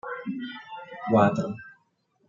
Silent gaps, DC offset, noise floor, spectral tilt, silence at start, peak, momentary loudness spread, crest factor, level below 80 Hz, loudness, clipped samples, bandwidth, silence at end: none; under 0.1%; -69 dBFS; -7.5 dB/octave; 0.05 s; -6 dBFS; 19 LU; 22 dB; -68 dBFS; -26 LUFS; under 0.1%; 7.4 kHz; 0.55 s